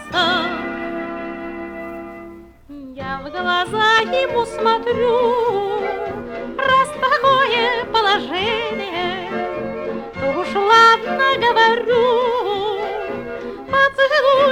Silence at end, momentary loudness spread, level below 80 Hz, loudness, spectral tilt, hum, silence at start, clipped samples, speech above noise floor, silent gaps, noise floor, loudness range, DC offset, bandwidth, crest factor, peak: 0 s; 15 LU; -48 dBFS; -17 LUFS; -4 dB/octave; none; 0 s; under 0.1%; 21 dB; none; -38 dBFS; 6 LU; under 0.1%; 14.5 kHz; 16 dB; -2 dBFS